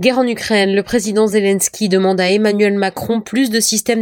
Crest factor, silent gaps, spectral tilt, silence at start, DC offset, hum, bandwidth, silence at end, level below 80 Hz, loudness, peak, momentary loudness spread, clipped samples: 12 dB; none; -4 dB/octave; 0 s; under 0.1%; none; 19 kHz; 0 s; -52 dBFS; -15 LUFS; -2 dBFS; 4 LU; under 0.1%